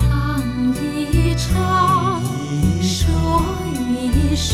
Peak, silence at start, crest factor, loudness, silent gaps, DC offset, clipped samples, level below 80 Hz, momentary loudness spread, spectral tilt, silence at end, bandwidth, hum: -4 dBFS; 0 s; 14 dB; -19 LUFS; none; 0.1%; under 0.1%; -24 dBFS; 6 LU; -5.5 dB/octave; 0 s; 15.5 kHz; none